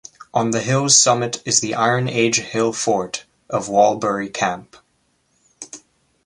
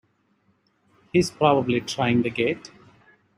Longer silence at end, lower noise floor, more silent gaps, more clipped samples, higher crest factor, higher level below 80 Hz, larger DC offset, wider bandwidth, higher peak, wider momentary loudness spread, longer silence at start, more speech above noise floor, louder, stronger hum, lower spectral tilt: second, 0.45 s vs 0.7 s; about the same, -65 dBFS vs -66 dBFS; neither; neither; about the same, 20 dB vs 22 dB; about the same, -60 dBFS vs -58 dBFS; neither; second, 11.5 kHz vs 13.5 kHz; first, 0 dBFS vs -4 dBFS; first, 18 LU vs 6 LU; second, 0.2 s vs 1.15 s; about the same, 46 dB vs 44 dB; first, -18 LUFS vs -23 LUFS; neither; second, -3 dB/octave vs -5.5 dB/octave